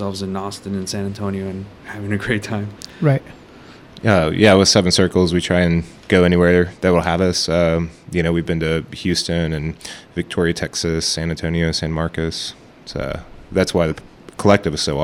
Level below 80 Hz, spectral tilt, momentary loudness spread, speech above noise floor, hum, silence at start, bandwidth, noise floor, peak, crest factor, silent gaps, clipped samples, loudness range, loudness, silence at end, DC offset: -38 dBFS; -5 dB/octave; 15 LU; 24 dB; none; 0 s; 15 kHz; -42 dBFS; 0 dBFS; 18 dB; none; under 0.1%; 7 LU; -18 LUFS; 0 s; under 0.1%